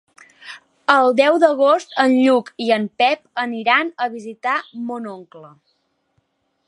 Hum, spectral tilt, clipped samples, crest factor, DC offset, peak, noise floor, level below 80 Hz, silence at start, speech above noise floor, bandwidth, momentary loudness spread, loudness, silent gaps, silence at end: none; -4.5 dB/octave; under 0.1%; 18 dB; under 0.1%; 0 dBFS; -67 dBFS; -76 dBFS; 0.45 s; 50 dB; 11.5 kHz; 16 LU; -17 LUFS; none; 1.2 s